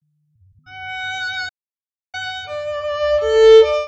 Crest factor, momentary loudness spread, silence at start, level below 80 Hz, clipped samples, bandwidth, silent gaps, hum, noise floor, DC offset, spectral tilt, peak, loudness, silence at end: 16 dB; 20 LU; 0.7 s; -46 dBFS; under 0.1%; 8 kHz; none; none; under -90 dBFS; under 0.1%; -2 dB/octave; 0 dBFS; -16 LUFS; 0 s